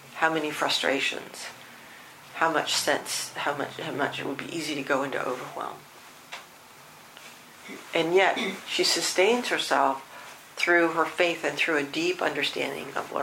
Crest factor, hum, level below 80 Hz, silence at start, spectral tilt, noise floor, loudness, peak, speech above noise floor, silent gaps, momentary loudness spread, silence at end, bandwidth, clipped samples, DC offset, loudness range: 22 dB; none; -74 dBFS; 0 s; -2.5 dB/octave; -50 dBFS; -26 LUFS; -6 dBFS; 23 dB; none; 23 LU; 0 s; 16 kHz; under 0.1%; under 0.1%; 8 LU